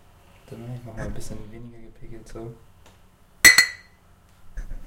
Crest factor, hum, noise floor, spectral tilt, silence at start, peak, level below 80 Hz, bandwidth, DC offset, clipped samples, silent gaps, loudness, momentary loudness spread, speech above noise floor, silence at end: 26 dB; none; -54 dBFS; -0.5 dB/octave; 0.5 s; 0 dBFS; -42 dBFS; 16 kHz; under 0.1%; under 0.1%; none; -14 LUFS; 29 LU; 19 dB; 0 s